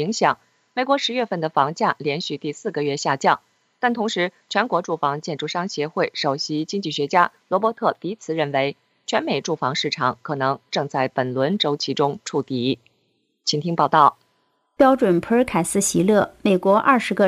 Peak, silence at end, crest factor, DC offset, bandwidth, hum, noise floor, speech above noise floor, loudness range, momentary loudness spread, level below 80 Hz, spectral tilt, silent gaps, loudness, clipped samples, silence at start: -2 dBFS; 0 s; 20 dB; under 0.1%; 15.5 kHz; none; -68 dBFS; 47 dB; 4 LU; 8 LU; -60 dBFS; -4.5 dB/octave; none; -21 LUFS; under 0.1%; 0 s